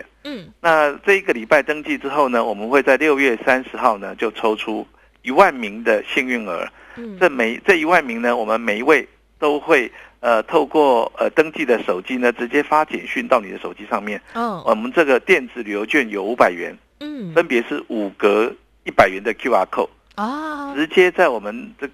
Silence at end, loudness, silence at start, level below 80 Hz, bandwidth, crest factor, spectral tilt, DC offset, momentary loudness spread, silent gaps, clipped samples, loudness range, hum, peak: 0.05 s; -18 LUFS; 0.25 s; -56 dBFS; 14 kHz; 18 dB; -4.5 dB/octave; under 0.1%; 12 LU; none; under 0.1%; 2 LU; none; 0 dBFS